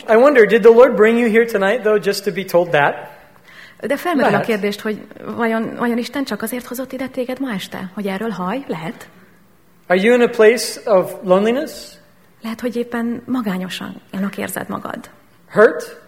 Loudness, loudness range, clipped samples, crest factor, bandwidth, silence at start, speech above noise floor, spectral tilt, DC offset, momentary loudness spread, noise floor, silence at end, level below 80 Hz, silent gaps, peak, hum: -16 LUFS; 9 LU; under 0.1%; 16 dB; 16.5 kHz; 0.05 s; 36 dB; -5 dB/octave; 0.2%; 16 LU; -53 dBFS; 0.1 s; -60 dBFS; none; 0 dBFS; none